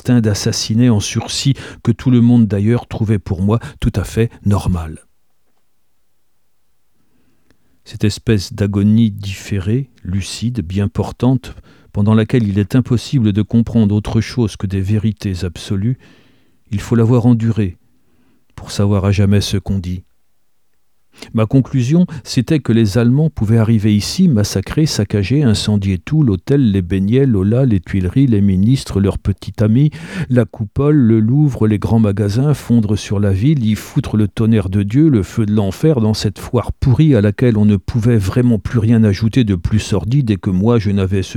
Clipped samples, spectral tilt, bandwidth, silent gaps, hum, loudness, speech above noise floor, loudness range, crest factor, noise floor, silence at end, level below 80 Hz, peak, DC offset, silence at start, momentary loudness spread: under 0.1%; -7 dB/octave; 14 kHz; none; none; -15 LUFS; 54 dB; 5 LU; 14 dB; -68 dBFS; 0 s; -36 dBFS; 0 dBFS; 0.2%; 0.05 s; 8 LU